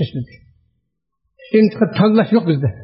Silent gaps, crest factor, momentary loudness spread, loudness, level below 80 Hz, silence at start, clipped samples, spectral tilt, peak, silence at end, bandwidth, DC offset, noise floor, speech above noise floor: none; 14 dB; 13 LU; -15 LUFS; -56 dBFS; 0 s; under 0.1%; -7 dB/octave; -2 dBFS; 0 s; 5.8 kHz; under 0.1%; -72 dBFS; 57 dB